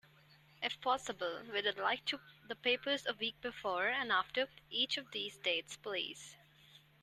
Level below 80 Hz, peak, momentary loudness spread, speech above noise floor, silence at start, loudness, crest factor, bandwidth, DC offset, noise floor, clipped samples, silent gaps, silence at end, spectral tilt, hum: -76 dBFS; -20 dBFS; 8 LU; 26 dB; 0.6 s; -37 LUFS; 20 dB; 13.5 kHz; under 0.1%; -65 dBFS; under 0.1%; none; 0.25 s; -2 dB/octave; none